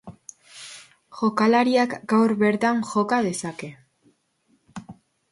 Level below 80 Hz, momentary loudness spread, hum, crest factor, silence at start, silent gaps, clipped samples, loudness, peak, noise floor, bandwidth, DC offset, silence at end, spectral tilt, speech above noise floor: -66 dBFS; 23 LU; none; 16 dB; 0.05 s; none; under 0.1%; -22 LUFS; -8 dBFS; -66 dBFS; 11.5 kHz; under 0.1%; 0.4 s; -5 dB/octave; 45 dB